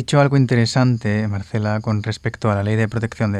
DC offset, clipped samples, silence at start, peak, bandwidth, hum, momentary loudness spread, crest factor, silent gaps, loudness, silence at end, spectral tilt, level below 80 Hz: under 0.1%; under 0.1%; 0 s; -2 dBFS; 10.5 kHz; none; 7 LU; 16 dB; none; -19 LUFS; 0 s; -6.5 dB/octave; -48 dBFS